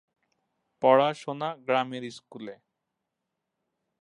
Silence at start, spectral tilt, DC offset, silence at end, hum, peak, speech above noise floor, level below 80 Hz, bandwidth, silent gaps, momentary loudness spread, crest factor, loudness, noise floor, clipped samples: 0.8 s; -5.5 dB/octave; under 0.1%; 1.45 s; none; -6 dBFS; 57 dB; -84 dBFS; 11 kHz; none; 21 LU; 24 dB; -26 LUFS; -84 dBFS; under 0.1%